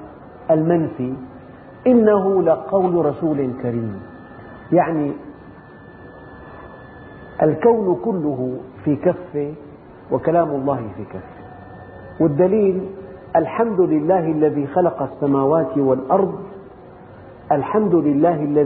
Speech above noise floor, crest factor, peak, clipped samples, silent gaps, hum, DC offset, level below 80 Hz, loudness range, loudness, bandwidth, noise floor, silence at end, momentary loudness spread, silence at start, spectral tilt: 23 dB; 18 dB; -2 dBFS; under 0.1%; none; none; under 0.1%; -52 dBFS; 5 LU; -19 LUFS; 4.2 kHz; -41 dBFS; 0 s; 23 LU; 0 s; -9 dB/octave